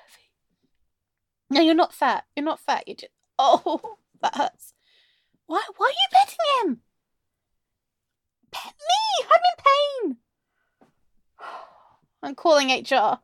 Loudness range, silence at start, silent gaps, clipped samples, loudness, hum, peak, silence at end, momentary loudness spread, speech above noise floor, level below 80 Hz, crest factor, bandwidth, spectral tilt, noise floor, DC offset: 3 LU; 1.5 s; none; under 0.1%; -22 LUFS; none; -4 dBFS; 0.05 s; 21 LU; 61 dB; -76 dBFS; 20 dB; 16.5 kHz; -2 dB/octave; -82 dBFS; under 0.1%